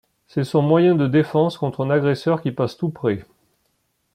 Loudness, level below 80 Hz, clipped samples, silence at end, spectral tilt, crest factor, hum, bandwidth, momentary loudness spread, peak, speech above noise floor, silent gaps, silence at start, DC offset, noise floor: -20 LUFS; -60 dBFS; under 0.1%; 0.9 s; -8.5 dB/octave; 16 dB; none; 13 kHz; 9 LU; -4 dBFS; 50 dB; none; 0.35 s; under 0.1%; -69 dBFS